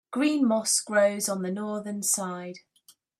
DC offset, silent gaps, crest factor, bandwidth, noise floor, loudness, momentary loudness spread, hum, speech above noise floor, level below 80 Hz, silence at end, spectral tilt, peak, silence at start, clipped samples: under 0.1%; none; 16 dB; 16 kHz; -61 dBFS; -26 LUFS; 11 LU; none; 35 dB; -78 dBFS; 0.6 s; -3 dB/octave; -10 dBFS; 0.1 s; under 0.1%